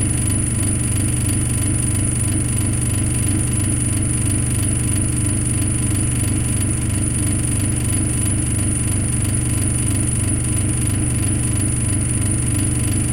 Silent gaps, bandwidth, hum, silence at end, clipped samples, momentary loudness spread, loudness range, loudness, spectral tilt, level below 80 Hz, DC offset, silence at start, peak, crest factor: none; 16.5 kHz; 50 Hz at -25 dBFS; 0 s; under 0.1%; 1 LU; 0 LU; -18 LUFS; -4.5 dB/octave; -28 dBFS; under 0.1%; 0 s; -6 dBFS; 12 dB